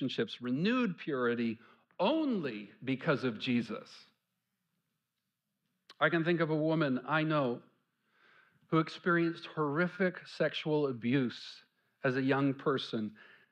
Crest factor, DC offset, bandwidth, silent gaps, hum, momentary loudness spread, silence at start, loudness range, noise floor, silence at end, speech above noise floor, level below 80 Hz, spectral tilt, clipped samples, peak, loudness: 20 dB; under 0.1%; 8.8 kHz; none; none; 8 LU; 0 s; 4 LU; -87 dBFS; 0.3 s; 54 dB; -80 dBFS; -7.5 dB/octave; under 0.1%; -14 dBFS; -33 LUFS